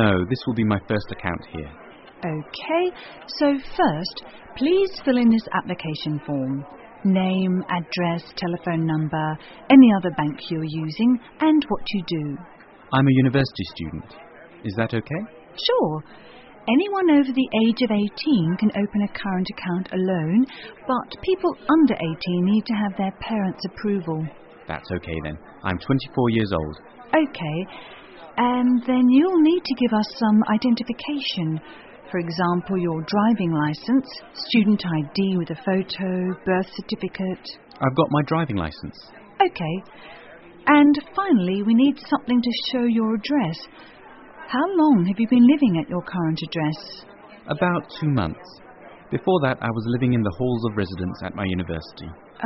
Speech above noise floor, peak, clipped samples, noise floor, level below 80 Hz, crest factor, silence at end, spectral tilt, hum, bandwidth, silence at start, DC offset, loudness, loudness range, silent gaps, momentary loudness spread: 22 dB; -2 dBFS; under 0.1%; -43 dBFS; -50 dBFS; 20 dB; 0 s; -5.5 dB/octave; none; 6 kHz; 0 s; under 0.1%; -22 LUFS; 6 LU; none; 15 LU